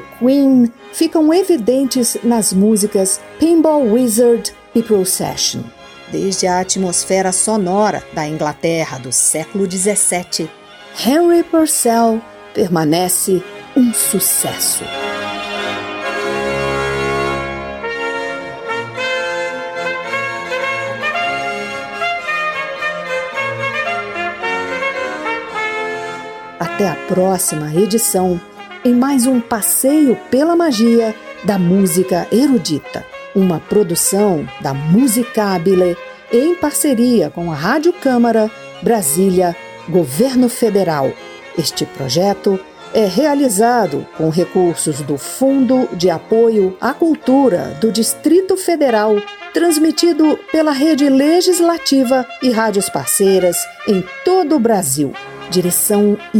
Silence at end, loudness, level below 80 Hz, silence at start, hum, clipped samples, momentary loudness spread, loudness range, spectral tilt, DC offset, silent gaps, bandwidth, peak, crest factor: 0 s; -15 LUFS; -50 dBFS; 0 s; none; under 0.1%; 9 LU; 6 LU; -4 dB/octave; under 0.1%; none; 19 kHz; 0 dBFS; 14 dB